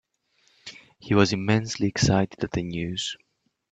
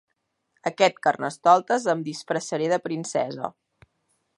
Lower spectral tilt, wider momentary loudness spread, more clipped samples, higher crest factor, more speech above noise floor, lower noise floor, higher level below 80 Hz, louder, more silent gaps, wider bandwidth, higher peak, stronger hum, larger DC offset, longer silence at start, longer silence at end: about the same, -5 dB/octave vs -4 dB/octave; first, 21 LU vs 12 LU; neither; about the same, 22 dB vs 22 dB; second, 43 dB vs 50 dB; second, -66 dBFS vs -73 dBFS; first, -50 dBFS vs -74 dBFS; about the same, -25 LUFS vs -24 LUFS; neither; second, 9 kHz vs 11.5 kHz; about the same, -4 dBFS vs -4 dBFS; neither; neither; about the same, 0.65 s vs 0.65 s; second, 0.55 s vs 0.9 s